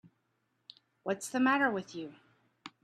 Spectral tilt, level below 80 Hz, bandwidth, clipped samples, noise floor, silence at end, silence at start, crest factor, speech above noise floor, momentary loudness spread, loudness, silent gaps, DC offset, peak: -4 dB/octave; -82 dBFS; 13.5 kHz; under 0.1%; -79 dBFS; 0.15 s; 0.05 s; 20 dB; 47 dB; 23 LU; -32 LUFS; none; under 0.1%; -16 dBFS